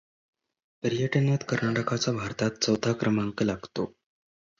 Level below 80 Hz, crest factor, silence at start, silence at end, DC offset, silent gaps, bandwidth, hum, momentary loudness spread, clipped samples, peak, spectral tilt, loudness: -60 dBFS; 18 dB; 0.85 s; 0.7 s; under 0.1%; none; 7.6 kHz; none; 8 LU; under 0.1%; -10 dBFS; -5.5 dB/octave; -28 LUFS